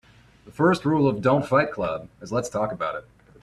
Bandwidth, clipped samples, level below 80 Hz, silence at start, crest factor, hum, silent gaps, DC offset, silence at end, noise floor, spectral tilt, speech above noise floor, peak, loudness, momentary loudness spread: 13 kHz; under 0.1%; -54 dBFS; 0.45 s; 18 dB; none; none; under 0.1%; 0.4 s; -51 dBFS; -6.5 dB/octave; 27 dB; -6 dBFS; -24 LUFS; 10 LU